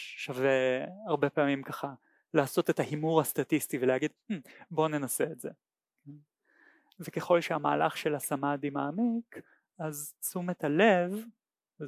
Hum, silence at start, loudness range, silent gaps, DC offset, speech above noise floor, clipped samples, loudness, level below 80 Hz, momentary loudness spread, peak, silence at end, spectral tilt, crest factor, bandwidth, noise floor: none; 0 s; 4 LU; none; under 0.1%; 35 dB; under 0.1%; -31 LUFS; -84 dBFS; 13 LU; -10 dBFS; 0 s; -5 dB/octave; 20 dB; 16 kHz; -65 dBFS